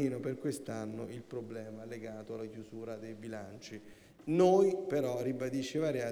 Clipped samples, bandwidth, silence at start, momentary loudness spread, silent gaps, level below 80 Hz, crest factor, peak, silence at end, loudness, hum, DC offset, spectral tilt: under 0.1%; 13.5 kHz; 0 s; 17 LU; none; -72 dBFS; 20 dB; -16 dBFS; 0 s; -35 LUFS; none; under 0.1%; -6.5 dB/octave